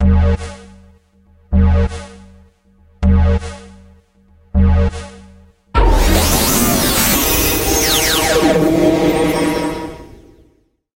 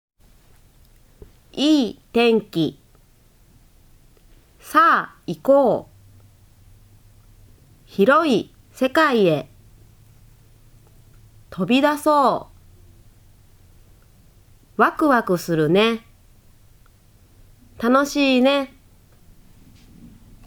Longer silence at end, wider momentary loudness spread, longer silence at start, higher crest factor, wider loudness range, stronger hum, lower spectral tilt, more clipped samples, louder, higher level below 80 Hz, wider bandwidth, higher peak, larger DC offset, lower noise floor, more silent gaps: second, 0.9 s vs 1.8 s; about the same, 13 LU vs 13 LU; second, 0 s vs 1.55 s; about the same, 16 dB vs 20 dB; first, 7 LU vs 3 LU; neither; about the same, -4.5 dB/octave vs -5.5 dB/octave; neither; first, -14 LUFS vs -19 LUFS; first, -20 dBFS vs -54 dBFS; second, 16.5 kHz vs over 20 kHz; about the same, 0 dBFS vs -2 dBFS; neither; about the same, -56 dBFS vs -53 dBFS; neither